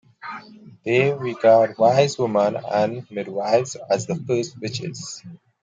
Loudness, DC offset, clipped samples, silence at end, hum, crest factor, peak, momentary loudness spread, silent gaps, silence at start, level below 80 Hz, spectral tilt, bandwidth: -21 LUFS; under 0.1%; under 0.1%; 0.25 s; none; 18 dB; -4 dBFS; 18 LU; none; 0.25 s; -66 dBFS; -5.5 dB/octave; 9.2 kHz